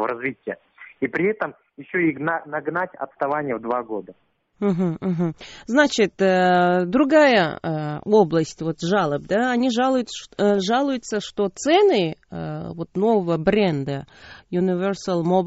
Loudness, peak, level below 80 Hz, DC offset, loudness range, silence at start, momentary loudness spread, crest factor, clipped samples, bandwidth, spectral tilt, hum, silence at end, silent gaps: -21 LUFS; -2 dBFS; -56 dBFS; under 0.1%; 7 LU; 0 s; 13 LU; 18 dB; under 0.1%; 8 kHz; -4.5 dB/octave; none; 0 s; none